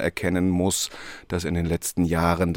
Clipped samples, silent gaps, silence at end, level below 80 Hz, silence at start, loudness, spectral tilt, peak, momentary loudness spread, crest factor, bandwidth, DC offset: under 0.1%; none; 0 s; -46 dBFS; 0 s; -24 LUFS; -5 dB/octave; -6 dBFS; 8 LU; 18 dB; 17 kHz; under 0.1%